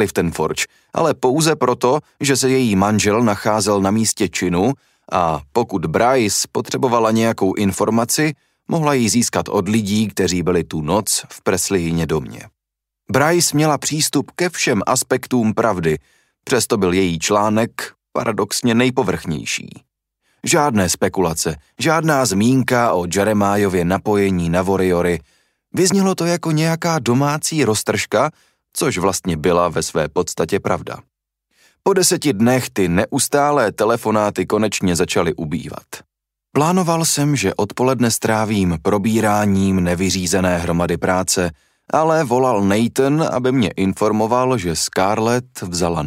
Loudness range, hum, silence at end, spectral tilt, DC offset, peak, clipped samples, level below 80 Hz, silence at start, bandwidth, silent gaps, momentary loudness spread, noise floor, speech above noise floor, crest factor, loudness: 2 LU; none; 0 s; -4.5 dB/octave; under 0.1%; -2 dBFS; under 0.1%; -46 dBFS; 0 s; 16 kHz; none; 7 LU; -82 dBFS; 65 dB; 16 dB; -17 LUFS